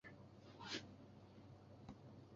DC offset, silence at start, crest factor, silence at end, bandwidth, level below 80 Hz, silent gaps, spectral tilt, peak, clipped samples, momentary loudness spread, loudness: under 0.1%; 0.05 s; 22 dB; 0 s; 7.4 kHz; -76 dBFS; none; -3 dB/octave; -34 dBFS; under 0.1%; 13 LU; -56 LUFS